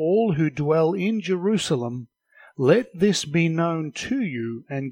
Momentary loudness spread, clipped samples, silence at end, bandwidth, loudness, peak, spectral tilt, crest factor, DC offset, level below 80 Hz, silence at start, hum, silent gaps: 11 LU; under 0.1%; 0 s; 16 kHz; -23 LUFS; -6 dBFS; -6 dB/octave; 18 dB; under 0.1%; -60 dBFS; 0 s; none; none